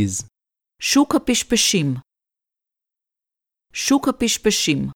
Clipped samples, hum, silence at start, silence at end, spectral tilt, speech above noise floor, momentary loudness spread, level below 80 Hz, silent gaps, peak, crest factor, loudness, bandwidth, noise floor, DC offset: under 0.1%; none; 0 s; 0.05 s; -3 dB/octave; 68 dB; 10 LU; -48 dBFS; none; -4 dBFS; 18 dB; -19 LUFS; 17.5 kHz; -87 dBFS; under 0.1%